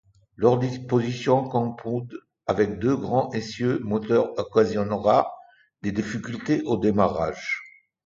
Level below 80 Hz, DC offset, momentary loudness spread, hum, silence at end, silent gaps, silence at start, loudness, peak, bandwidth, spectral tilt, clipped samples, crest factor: -54 dBFS; under 0.1%; 9 LU; none; 0.35 s; none; 0.4 s; -24 LUFS; -4 dBFS; 7.6 kHz; -7 dB/octave; under 0.1%; 20 dB